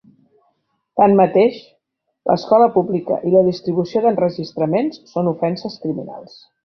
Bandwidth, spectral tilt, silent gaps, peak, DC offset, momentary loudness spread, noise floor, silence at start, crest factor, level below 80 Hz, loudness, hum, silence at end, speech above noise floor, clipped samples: 6.4 kHz; -8.5 dB/octave; none; -2 dBFS; under 0.1%; 13 LU; -72 dBFS; 0.95 s; 16 dB; -60 dBFS; -17 LUFS; none; 0.4 s; 55 dB; under 0.1%